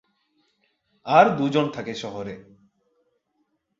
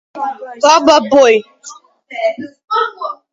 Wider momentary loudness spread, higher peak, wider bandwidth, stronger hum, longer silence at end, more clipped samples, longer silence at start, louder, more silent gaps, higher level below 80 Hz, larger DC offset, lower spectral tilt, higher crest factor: first, 21 LU vs 18 LU; about the same, -2 dBFS vs 0 dBFS; about the same, 7.8 kHz vs 7.8 kHz; neither; first, 1.4 s vs 0.2 s; neither; first, 1.05 s vs 0.15 s; second, -21 LUFS vs -12 LUFS; second, none vs 2.64-2.68 s; second, -66 dBFS vs -58 dBFS; neither; first, -6 dB/octave vs -2.5 dB/octave; first, 24 dB vs 14 dB